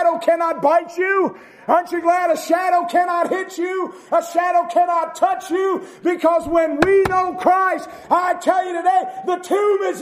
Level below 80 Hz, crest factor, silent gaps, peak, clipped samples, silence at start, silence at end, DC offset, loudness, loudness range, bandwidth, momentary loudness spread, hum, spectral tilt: -52 dBFS; 18 dB; none; 0 dBFS; under 0.1%; 0 s; 0 s; under 0.1%; -18 LUFS; 2 LU; 15 kHz; 6 LU; none; -4.5 dB/octave